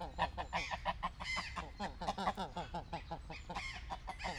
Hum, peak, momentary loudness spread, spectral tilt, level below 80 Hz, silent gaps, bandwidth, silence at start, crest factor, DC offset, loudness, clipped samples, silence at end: none; -22 dBFS; 7 LU; -4 dB/octave; -52 dBFS; none; 15.5 kHz; 0 s; 20 dB; under 0.1%; -42 LUFS; under 0.1%; 0 s